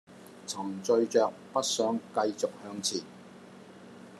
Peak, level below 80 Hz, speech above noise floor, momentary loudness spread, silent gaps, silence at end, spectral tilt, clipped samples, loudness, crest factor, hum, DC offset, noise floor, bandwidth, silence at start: -12 dBFS; -84 dBFS; 20 dB; 23 LU; none; 0 s; -3 dB/octave; under 0.1%; -30 LUFS; 20 dB; none; under 0.1%; -50 dBFS; 13 kHz; 0.1 s